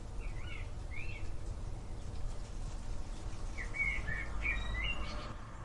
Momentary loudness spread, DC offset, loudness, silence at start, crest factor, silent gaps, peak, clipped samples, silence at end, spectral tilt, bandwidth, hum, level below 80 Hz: 11 LU; under 0.1%; -41 LUFS; 0 s; 14 dB; none; -24 dBFS; under 0.1%; 0 s; -4.5 dB/octave; 11.5 kHz; none; -42 dBFS